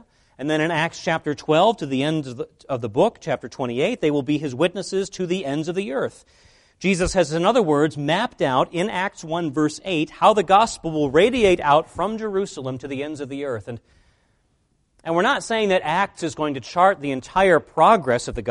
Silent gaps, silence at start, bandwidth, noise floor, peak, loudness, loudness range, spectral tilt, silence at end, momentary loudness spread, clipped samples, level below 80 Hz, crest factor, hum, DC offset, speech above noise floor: none; 0.4 s; 11.5 kHz; -66 dBFS; -2 dBFS; -21 LUFS; 5 LU; -5 dB/octave; 0 s; 12 LU; under 0.1%; -48 dBFS; 20 dB; none; under 0.1%; 45 dB